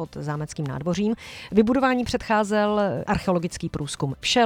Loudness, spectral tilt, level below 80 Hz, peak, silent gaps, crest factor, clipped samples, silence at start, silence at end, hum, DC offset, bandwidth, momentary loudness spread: -24 LUFS; -5 dB/octave; -46 dBFS; -4 dBFS; none; 18 dB; under 0.1%; 0 s; 0 s; none; under 0.1%; 15.5 kHz; 9 LU